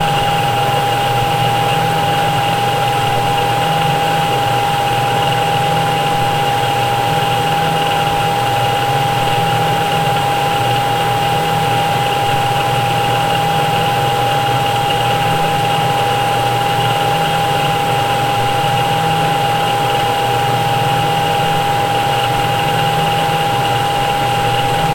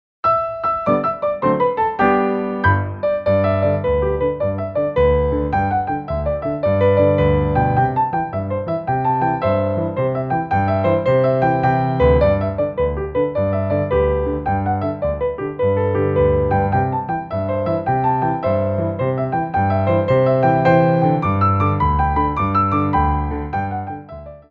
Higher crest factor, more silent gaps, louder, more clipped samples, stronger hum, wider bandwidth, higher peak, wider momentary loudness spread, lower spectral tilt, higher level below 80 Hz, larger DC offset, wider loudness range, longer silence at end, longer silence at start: about the same, 12 dB vs 16 dB; neither; first, -14 LUFS vs -18 LUFS; neither; neither; first, 16 kHz vs 5.2 kHz; about the same, -2 dBFS vs -2 dBFS; second, 1 LU vs 7 LU; second, -4 dB/octave vs -10 dB/octave; second, -38 dBFS vs -32 dBFS; first, 0.6% vs under 0.1%; second, 0 LU vs 3 LU; about the same, 0 s vs 0.1 s; second, 0 s vs 0.25 s